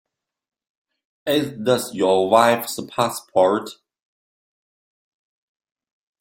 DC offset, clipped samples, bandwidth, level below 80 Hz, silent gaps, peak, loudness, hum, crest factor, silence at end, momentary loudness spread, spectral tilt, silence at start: under 0.1%; under 0.1%; 16.5 kHz; -64 dBFS; none; -2 dBFS; -19 LUFS; none; 22 dB; 2.45 s; 11 LU; -4 dB/octave; 1.25 s